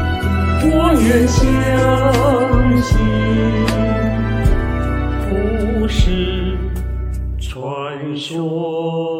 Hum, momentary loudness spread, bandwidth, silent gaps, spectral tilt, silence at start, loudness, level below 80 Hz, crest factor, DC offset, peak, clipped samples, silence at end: none; 11 LU; 16 kHz; none; -6.5 dB/octave; 0 s; -17 LUFS; -22 dBFS; 14 dB; under 0.1%; 0 dBFS; under 0.1%; 0 s